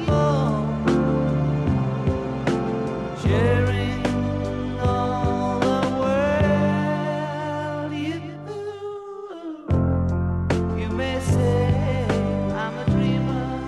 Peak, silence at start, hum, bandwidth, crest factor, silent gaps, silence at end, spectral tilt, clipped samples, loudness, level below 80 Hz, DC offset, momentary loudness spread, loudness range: -8 dBFS; 0 s; none; 11.5 kHz; 14 dB; none; 0 s; -7.5 dB/octave; under 0.1%; -23 LUFS; -36 dBFS; under 0.1%; 9 LU; 4 LU